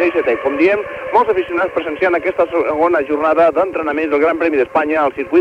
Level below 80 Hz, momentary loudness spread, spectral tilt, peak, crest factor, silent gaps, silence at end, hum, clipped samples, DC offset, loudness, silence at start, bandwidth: -50 dBFS; 4 LU; -6.5 dB/octave; -2 dBFS; 12 dB; none; 0 s; none; under 0.1%; under 0.1%; -15 LUFS; 0 s; 8.6 kHz